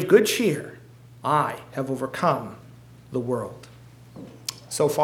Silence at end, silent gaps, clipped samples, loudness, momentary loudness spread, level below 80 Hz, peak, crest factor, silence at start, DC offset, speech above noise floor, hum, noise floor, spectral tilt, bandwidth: 0 s; none; under 0.1%; -25 LUFS; 21 LU; -62 dBFS; -4 dBFS; 22 dB; 0 s; under 0.1%; 24 dB; none; -47 dBFS; -4.5 dB/octave; 17 kHz